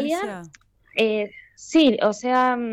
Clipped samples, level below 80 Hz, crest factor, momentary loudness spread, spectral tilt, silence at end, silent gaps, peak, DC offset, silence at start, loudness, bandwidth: under 0.1%; -62 dBFS; 14 dB; 15 LU; -4 dB/octave; 0 s; none; -8 dBFS; under 0.1%; 0 s; -21 LUFS; 13.5 kHz